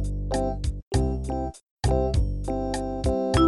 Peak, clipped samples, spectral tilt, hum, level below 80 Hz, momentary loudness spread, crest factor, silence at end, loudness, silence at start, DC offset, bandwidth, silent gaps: -8 dBFS; under 0.1%; -6.5 dB/octave; none; -30 dBFS; 7 LU; 16 dB; 0 s; -27 LUFS; 0 s; under 0.1%; 12 kHz; 0.82-0.91 s, 1.71-1.77 s